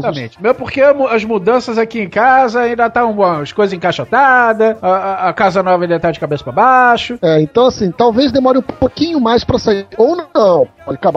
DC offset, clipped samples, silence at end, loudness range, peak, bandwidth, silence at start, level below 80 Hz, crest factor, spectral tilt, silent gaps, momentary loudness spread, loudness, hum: under 0.1%; under 0.1%; 0 s; 1 LU; 0 dBFS; 8 kHz; 0 s; -42 dBFS; 12 dB; -6 dB/octave; none; 7 LU; -12 LUFS; none